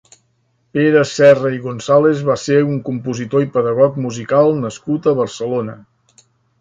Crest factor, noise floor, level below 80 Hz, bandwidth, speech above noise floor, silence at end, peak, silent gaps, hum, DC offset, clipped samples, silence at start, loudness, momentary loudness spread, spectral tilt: 16 dB; -62 dBFS; -56 dBFS; 9 kHz; 47 dB; 0.85 s; 0 dBFS; none; none; under 0.1%; under 0.1%; 0.75 s; -15 LUFS; 12 LU; -6.5 dB/octave